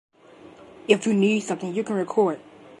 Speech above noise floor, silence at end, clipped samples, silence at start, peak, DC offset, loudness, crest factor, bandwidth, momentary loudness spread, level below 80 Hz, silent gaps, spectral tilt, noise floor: 26 dB; 0.4 s; under 0.1%; 0.85 s; -4 dBFS; under 0.1%; -23 LUFS; 22 dB; 11.5 kHz; 9 LU; -72 dBFS; none; -5.5 dB/octave; -49 dBFS